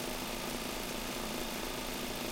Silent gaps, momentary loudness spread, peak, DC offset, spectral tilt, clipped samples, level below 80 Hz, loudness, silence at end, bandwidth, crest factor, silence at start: none; 0 LU; -24 dBFS; under 0.1%; -2.5 dB/octave; under 0.1%; -50 dBFS; -38 LUFS; 0 s; 16.5 kHz; 14 dB; 0 s